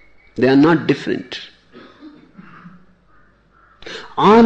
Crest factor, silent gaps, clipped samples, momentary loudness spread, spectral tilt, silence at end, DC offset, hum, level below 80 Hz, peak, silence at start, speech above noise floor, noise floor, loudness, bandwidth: 16 dB; none; under 0.1%; 22 LU; -7 dB/octave; 0 s; under 0.1%; none; -52 dBFS; -2 dBFS; 0.35 s; 40 dB; -53 dBFS; -16 LUFS; 8.2 kHz